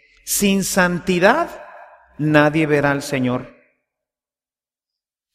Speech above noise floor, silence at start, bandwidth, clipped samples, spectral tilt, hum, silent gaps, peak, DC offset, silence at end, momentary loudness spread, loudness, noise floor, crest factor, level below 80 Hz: over 73 dB; 0.25 s; 16 kHz; under 0.1%; -4.5 dB/octave; none; none; 0 dBFS; under 0.1%; 1.85 s; 10 LU; -18 LUFS; under -90 dBFS; 20 dB; -50 dBFS